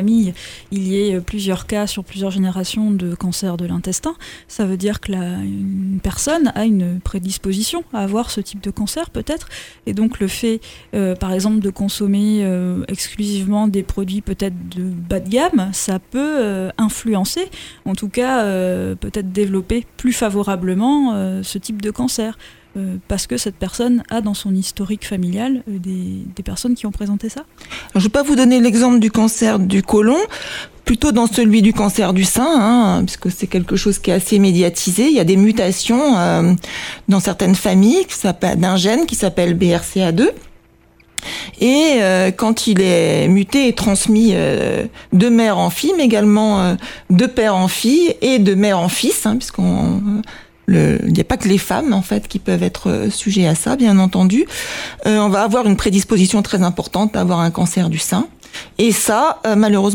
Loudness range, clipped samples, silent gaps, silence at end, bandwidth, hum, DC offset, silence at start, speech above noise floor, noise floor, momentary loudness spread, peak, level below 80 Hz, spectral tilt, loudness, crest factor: 7 LU; under 0.1%; none; 0 s; 18.5 kHz; none; under 0.1%; 0 s; 35 dB; -50 dBFS; 11 LU; -2 dBFS; -38 dBFS; -5 dB/octave; -16 LUFS; 12 dB